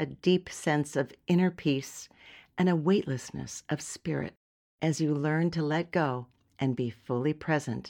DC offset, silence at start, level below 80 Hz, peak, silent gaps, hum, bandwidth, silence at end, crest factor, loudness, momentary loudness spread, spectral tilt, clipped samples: under 0.1%; 0 s; -64 dBFS; -12 dBFS; 4.37-4.78 s; none; 16 kHz; 0 s; 18 dB; -30 LUFS; 12 LU; -6 dB/octave; under 0.1%